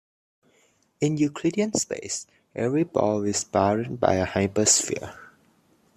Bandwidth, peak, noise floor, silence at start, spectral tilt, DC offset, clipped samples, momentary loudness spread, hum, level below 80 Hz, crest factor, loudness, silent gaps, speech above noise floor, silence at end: 14 kHz; -4 dBFS; -64 dBFS; 1 s; -4 dB/octave; under 0.1%; under 0.1%; 12 LU; none; -62 dBFS; 22 dB; -24 LUFS; none; 40 dB; 0.7 s